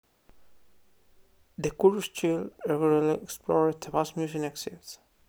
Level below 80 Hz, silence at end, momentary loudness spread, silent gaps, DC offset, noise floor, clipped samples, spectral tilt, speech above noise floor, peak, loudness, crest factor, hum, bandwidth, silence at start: -62 dBFS; 0.35 s; 15 LU; none; under 0.1%; -64 dBFS; under 0.1%; -5.5 dB/octave; 37 dB; -8 dBFS; -28 LUFS; 22 dB; none; over 20 kHz; 1.6 s